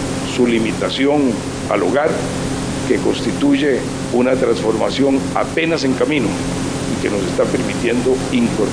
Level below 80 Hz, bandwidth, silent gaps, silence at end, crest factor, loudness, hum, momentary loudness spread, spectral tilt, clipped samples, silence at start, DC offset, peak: -38 dBFS; 10.5 kHz; none; 0 s; 14 dB; -17 LUFS; none; 6 LU; -5 dB/octave; under 0.1%; 0 s; under 0.1%; -2 dBFS